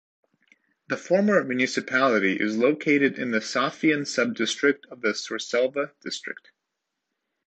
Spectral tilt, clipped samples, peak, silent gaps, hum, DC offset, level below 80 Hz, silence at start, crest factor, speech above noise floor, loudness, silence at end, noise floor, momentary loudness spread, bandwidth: -4 dB/octave; under 0.1%; -8 dBFS; none; none; under 0.1%; -74 dBFS; 0.9 s; 18 dB; 58 dB; -24 LUFS; 1.15 s; -82 dBFS; 12 LU; 9 kHz